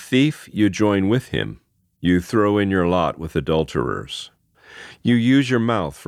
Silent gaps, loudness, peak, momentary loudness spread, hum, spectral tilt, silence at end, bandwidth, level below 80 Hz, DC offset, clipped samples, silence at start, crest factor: none; -20 LUFS; -4 dBFS; 13 LU; none; -6.5 dB/octave; 0.05 s; 14.5 kHz; -46 dBFS; under 0.1%; under 0.1%; 0 s; 16 dB